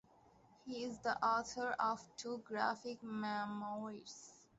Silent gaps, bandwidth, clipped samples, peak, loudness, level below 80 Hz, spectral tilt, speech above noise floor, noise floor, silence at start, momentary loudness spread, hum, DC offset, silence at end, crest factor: none; 8 kHz; under 0.1%; -22 dBFS; -41 LUFS; -78 dBFS; -2.5 dB/octave; 27 dB; -68 dBFS; 0.65 s; 13 LU; none; under 0.1%; 0.2 s; 20 dB